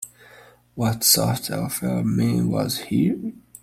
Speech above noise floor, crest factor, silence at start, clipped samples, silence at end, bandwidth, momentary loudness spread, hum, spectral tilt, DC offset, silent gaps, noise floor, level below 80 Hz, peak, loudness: 28 dB; 22 dB; 0 s; under 0.1%; 0.25 s; 16.5 kHz; 14 LU; none; -4.5 dB/octave; under 0.1%; none; -50 dBFS; -52 dBFS; -2 dBFS; -21 LUFS